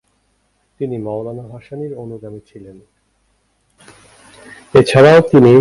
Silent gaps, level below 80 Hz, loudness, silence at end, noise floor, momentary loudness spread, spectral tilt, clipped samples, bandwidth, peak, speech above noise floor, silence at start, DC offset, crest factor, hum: none; -48 dBFS; -11 LUFS; 0 s; -62 dBFS; 24 LU; -7 dB/octave; under 0.1%; 11.5 kHz; 0 dBFS; 49 dB; 0.8 s; under 0.1%; 16 dB; none